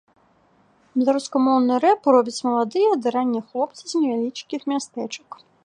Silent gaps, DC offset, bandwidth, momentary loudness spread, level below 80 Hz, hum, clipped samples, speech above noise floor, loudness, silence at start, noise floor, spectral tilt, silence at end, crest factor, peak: none; under 0.1%; 10 kHz; 11 LU; -78 dBFS; none; under 0.1%; 38 dB; -21 LUFS; 0.95 s; -59 dBFS; -4.5 dB/octave; 0.3 s; 18 dB; -4 dBFS